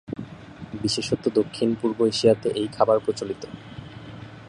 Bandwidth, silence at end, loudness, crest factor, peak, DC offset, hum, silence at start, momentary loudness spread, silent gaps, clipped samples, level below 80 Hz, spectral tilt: 11 kHz; 0 s; -23 LUFS; 20 dB; -4 dBFS; under 0.1%; none; 0.1 s; 20 LU; none; under 0.1%; -56 dBFS; -5.5 dB/octave